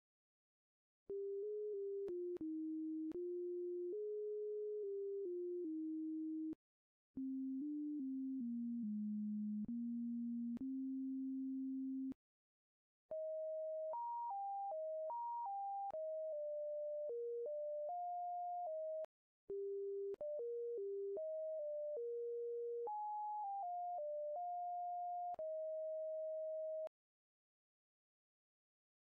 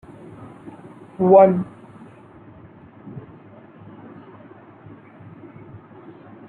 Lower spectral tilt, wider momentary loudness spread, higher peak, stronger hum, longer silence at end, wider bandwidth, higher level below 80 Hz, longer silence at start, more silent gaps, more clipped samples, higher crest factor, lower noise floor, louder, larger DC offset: second, -8 dB/octave vs -11 dB/octave; second, 1 LU vs 31 LU; second, -40 dBFS vs -2 dBFS; neither; second, 2.3 s vs 3.3 s; second, 2.4 kHz vs 3.7 kHz; second, -88 dBFS vs -64 dBFS; about the same, 1.1 s vs 1.2 s; first, 6.55-7.14 s, 12.15-13.09 s, 19.05-19.48 s vs none; neither; second, 6 dB vs 22 dB; first, under -90 dBFS vs -45 dBFS; second, -45 LUFS vs -15 LUFS; neither